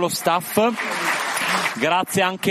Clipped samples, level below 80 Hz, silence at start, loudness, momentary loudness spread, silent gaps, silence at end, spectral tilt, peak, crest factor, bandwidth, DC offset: under 0.1%; -66 dBFS; 0 s; -20 LUFS; 2 LU; none; 0 s; -3 dB/octave; -2 dBFS; 18 dB; 15.5 kHz; under 0.1%